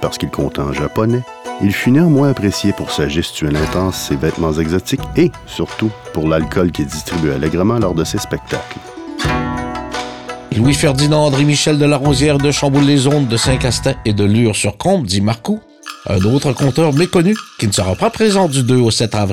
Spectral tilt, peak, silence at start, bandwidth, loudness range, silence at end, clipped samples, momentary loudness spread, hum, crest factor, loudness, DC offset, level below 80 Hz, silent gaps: -5.5 dB/octave; -4 dBFS; 0 s; 16.5 kHz; 5 LU; 0 s; under 0.1%; 10 LU; none; 12 dB; -15 LUFS; under 0.1%; -34 dBFS; none